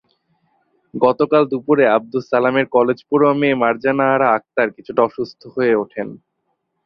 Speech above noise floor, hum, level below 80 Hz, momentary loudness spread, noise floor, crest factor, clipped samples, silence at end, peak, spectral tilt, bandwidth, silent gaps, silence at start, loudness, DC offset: 55 dB; none; -62 dBFS; 10 LU; -71 dBFS; 16 dB; under 0.1%; 0.7 s; -2 dBFS; -8 dB/octave; 6.2 kHz; none; 0.95 s; -17 LUFS; under 0.1%